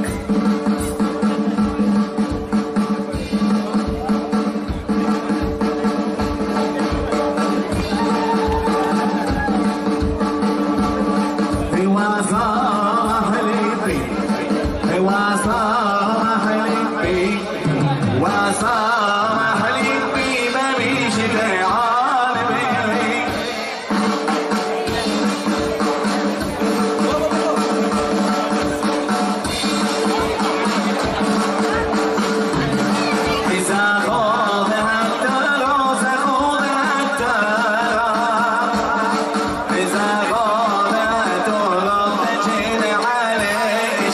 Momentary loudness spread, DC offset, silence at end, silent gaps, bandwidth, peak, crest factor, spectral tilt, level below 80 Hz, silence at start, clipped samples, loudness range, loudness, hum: 4 LU; under 0.1%; 0 s; none; 13.5 kHz; -6 dBFS; 12 dB; -5 dB/octave; -38 dBFS; 0 s; under 0.1%; 3 LU; -18 LUFS; none